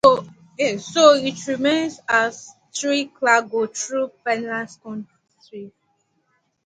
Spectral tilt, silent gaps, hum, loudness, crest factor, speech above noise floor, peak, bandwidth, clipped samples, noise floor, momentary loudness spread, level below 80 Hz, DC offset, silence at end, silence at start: -3 dB/octave; none; none; -20 LUFS; 20 dB; 48 dB; 0 dBFS; 9.6 kHz; under 0.1%; -68 dBFS; 23 LU; -66 dBFS; under 0.1%; 0.95 s; 0.05 s